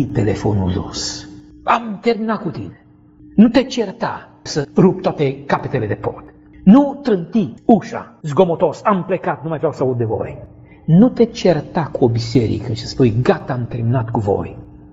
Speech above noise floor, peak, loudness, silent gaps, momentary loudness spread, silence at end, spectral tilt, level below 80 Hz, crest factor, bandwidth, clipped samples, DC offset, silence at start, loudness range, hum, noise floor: 28 dB; 0 dBFS; -17 LUFS; none; 14 LU; 0.15 s; -7 dB/octave; -44 dBFS; 16 dB; 8 kHz; under 0.1%; under 0.1%; 0 s; 3 LU; none; -45 dBFS